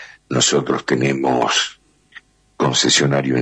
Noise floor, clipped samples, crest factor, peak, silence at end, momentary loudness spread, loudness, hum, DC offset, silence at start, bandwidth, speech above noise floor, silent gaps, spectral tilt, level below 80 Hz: -46 dBFS; under 0.1%; 14 dB; -4 dBFS; 0 s; 7 LU; -17 LUFS; none; under 0.1%; 0 s; 10.5 kHz; 29 dB; none; -3.5 dB/octave; -56 dBFS